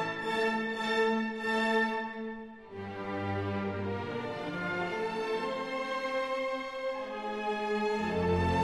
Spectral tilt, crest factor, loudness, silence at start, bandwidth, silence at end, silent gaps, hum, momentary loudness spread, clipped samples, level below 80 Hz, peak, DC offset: -6 dB/octave; 16 dB; -33 LUFS; 0 s; 12.5 kHz; 0 s; none; none; 9 LU; under 0.1%; -56 dBFS; -16 dBFS; under 0.1%